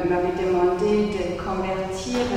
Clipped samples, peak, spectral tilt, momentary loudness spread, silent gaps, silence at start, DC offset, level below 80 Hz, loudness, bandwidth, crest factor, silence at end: under 0.1%; -10 dBFS; -6 dB/octave; 6 LU; none; 0 s; under 0.1%; -42 dBFS; -23 LUFS; 11 kHz; 12 dB; 0 s